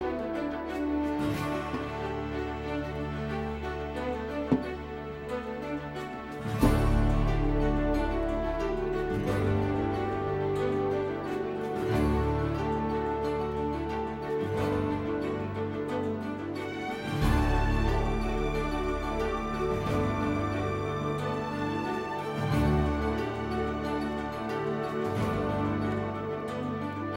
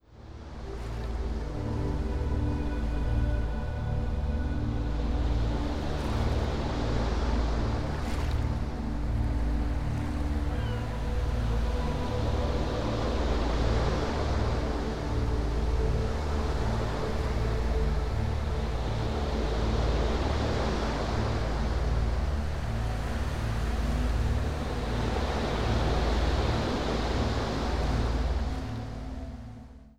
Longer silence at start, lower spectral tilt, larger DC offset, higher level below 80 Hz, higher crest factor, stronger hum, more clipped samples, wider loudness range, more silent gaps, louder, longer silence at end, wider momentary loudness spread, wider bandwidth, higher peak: about the same, 0 s vs 0.1 s; about the same, -7.5 dB/octave vs -6.5 dB/octave; second, under 0.1% vs 0.2%; second, -38 dBFS vs -32 dBFS; about the same, 18 dB vs 14 dB; neither; neither; about the same, 4 LU vs 2 LU; neither; about the same, -31 LUFS vs -31 LUFS; about the same, 0 s vs 0.05 s; about the same, 7 LU vs 5 LU; first, 16.5 kHz vs 10.5 kHz; first, -10 dBFS vs -14 dBFS